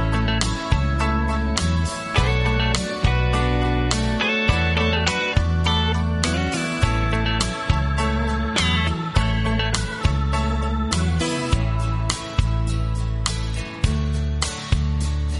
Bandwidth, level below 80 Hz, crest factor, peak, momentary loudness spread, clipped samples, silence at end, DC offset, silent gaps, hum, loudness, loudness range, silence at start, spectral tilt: 11.5 kHz; -26 dBFS; 18 dB; -2 dBFS; 4 LU; under 0.1%; 0 s; under 0.1%; none; none; -22 LUFS; 3 LU; 0 s; -5 dB/octave